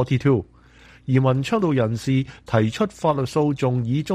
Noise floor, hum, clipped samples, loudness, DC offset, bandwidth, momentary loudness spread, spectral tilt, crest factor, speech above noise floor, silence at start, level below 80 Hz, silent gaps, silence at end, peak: -49 dBFS; none; under 0.1%; -21 LUFS; under 0.1%; 12 kHz; 4 LU; -7.5 dB/octave; 14 dB; 29 dB; 0 s; -50 dBFS; none; 0 s; -6 dBFS